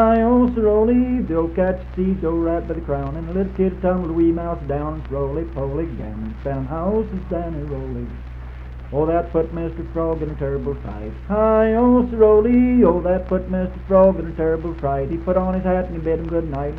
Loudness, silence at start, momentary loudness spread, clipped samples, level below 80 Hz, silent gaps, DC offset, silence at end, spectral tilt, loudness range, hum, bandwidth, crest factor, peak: -20 LUFS; 0 s; 13 LU; under 0.1%; -30 dBFS; none; under 0.1%; 0 s; -11 dB/octave; 8 LU; none; 4.4 kHz; 16 dB; -2 dBFS